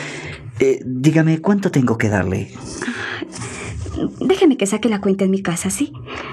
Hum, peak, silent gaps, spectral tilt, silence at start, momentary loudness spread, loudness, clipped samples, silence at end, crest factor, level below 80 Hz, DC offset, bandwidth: none; -2 dBFS; none; -6 dB/octave; 0 s; 13 LU; -19 LUFS; under 0.1%; 0 s; 18 dB; -46 dBFS; under 0.1%; 13.5 kHz